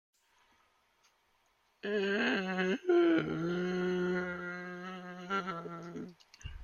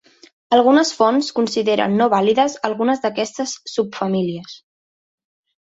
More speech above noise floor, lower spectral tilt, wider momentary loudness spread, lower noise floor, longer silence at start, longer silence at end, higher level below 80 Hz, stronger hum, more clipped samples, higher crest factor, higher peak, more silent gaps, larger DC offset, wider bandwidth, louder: second, 42 dB vs over 73 dB; first, -6.5 dB/octave vs -4.5 dB/octave; first, 17 LU vs 9 LU; second, -73 dBFS vs under -90 dBFS; first, 1.85 s vs 0.5 s; second, 0 s vs 1.05 s; about the same, -62 dBFS vs -64 dBFS; neither; neither; about the same, 18 dB vs 16 dB; second, -18 dBFS vs -2 dBFS; neither; neither; second, 7.2 kHz vs 8 kHz; second, -34 LUFS vs -18 LUFS